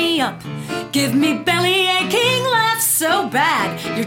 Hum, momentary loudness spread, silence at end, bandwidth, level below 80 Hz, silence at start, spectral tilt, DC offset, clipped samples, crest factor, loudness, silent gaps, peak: none; 8 LU; 0 s; 17 kHz; -58 dBFS; 0 s; -3 dB/octave; under 0.1%; under 0.1%; 14 dB; -16 LUFS; none; -4 dBFS